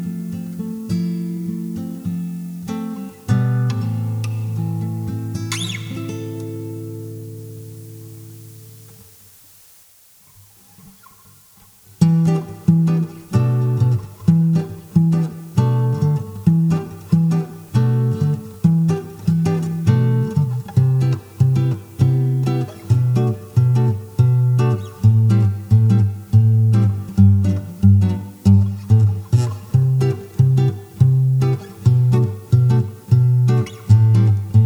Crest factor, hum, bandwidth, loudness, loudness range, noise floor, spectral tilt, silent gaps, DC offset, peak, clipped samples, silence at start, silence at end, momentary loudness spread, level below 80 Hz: 16 dB; none; 19.5 kHz; -18 LUFS; 10 LU; -50 dBFS; -8.5 dB/octave; none; under 0.1%; -2 dBFS; under 0.1%; 0 s; 0 s; 13 LU; -48 dBFS